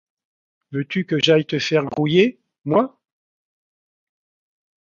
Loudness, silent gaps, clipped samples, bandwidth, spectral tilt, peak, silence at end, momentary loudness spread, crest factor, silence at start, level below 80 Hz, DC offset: -19 LUFS; 2.58-2.62 s; under 0.1%; 7.4 kHz; -6 dB/octave; -2 dBFS; 2 s; 12 LU; 20 dB; 0.7 s; -64 dBFS; under 0.1%